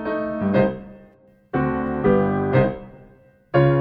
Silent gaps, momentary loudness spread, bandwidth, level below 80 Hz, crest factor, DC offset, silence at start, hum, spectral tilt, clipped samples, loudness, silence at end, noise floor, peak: none; 8 LU; 4.9 kHz; -44 dBFS; 16 dB; under 0.1%; 0 s; none; -11 dB/octave; under 0.1%; -21 LUFS; 0 s; -52 dBFS; -6 dBFS